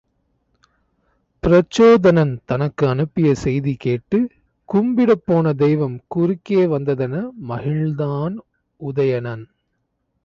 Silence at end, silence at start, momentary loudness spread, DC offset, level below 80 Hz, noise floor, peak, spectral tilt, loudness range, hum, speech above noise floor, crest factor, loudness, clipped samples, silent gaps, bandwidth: 0.8 s; 1.45 s; 13 LU; under 0.1%; -46 dBFS; -71 dBFS; -4 dBFS; -8 dB/octave; 5 LU; none; 54 dB; 16 dB; -18 LUFS; under 0.1%; none; 7.8 kHz